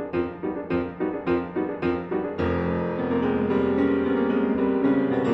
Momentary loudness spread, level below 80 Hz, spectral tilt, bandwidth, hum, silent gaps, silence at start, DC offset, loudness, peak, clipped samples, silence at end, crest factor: 6 LU; -54 dBFS; -9.5 dB/octave; 5.8 kHz; none; none; 0 s; under 0.1%; -25 LUFS; -10 dBFS; under 0.1%; 0 s; 14 dB